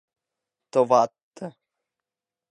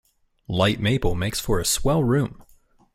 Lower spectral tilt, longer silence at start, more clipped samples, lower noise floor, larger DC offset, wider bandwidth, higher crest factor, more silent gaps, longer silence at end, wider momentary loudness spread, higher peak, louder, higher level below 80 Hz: about the same, -5.5 dB/octave vs -4.5 dB/octave; first, 0.75 s vs 0.5 s; neither; first, -88 dBFS vs -57 dBFS; neither; second, 10.5 kHz vs 16 kHz; first, 22 dB vs 16 dB; first, 1.23-1.31 s vs none; first, 1.05 s vs 0.6 s; first, 20 LU vs 6 LU; first, -4 dBFS vs -8 dBFS; about the same, -22 LUFS vs -23 LUFS; second, -82 dBFS vs -36 dBFS